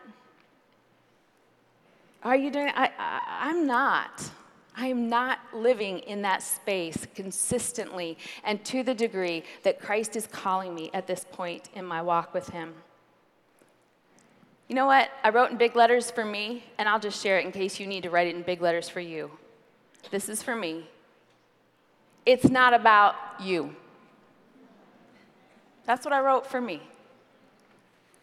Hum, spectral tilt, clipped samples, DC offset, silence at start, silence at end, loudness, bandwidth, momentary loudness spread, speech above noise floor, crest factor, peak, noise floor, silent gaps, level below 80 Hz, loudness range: none; -3.5 dB/octave; under 0.1%; under 0.1%; 0.05 s; 1.35 s; -26 LUFS; 15 kHz; 15 LU; 38 dB; 22 dB; -6 dBFS; -65 dBFS; none; -68 dBFS; 9 LU